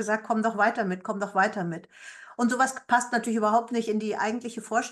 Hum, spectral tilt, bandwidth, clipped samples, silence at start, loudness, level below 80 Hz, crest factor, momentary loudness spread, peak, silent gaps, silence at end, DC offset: none; -4.5 dB/octave; 12.5 kHz; under 0.1%; 0 s; -26 LUFS; -76 dBFS; 18 dB; 10 LU; -10 dBFS; none; 0 s; under 0.1%